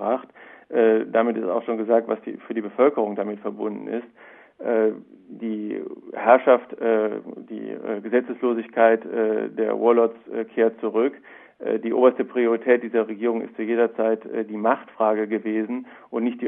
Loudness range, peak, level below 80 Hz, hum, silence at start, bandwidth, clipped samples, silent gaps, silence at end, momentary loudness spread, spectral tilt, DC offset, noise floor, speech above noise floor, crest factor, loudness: 4 LU; -2 dBFS; -78 dBFS; none; 0 s; 3.8 kHz; under 0.1%; none; 0 s; 13 LU; -10 dB/octave; under 0.1%; -46 dBFS; 24 dB; 20 dB; -23 LUFS